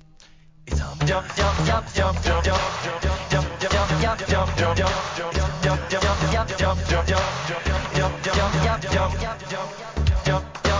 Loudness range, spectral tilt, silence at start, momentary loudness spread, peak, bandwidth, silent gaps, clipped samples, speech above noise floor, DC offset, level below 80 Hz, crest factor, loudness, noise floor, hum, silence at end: 1 LU; -5 dB/octave; 0.65 s; 5 LU; -8 dBFS; 7.6 kHz; none; under 0.1%; 27 dB; under 0.1%; -28 dBFS; 14 dB; -23 LUFS; -49 dBFS; none; 0 s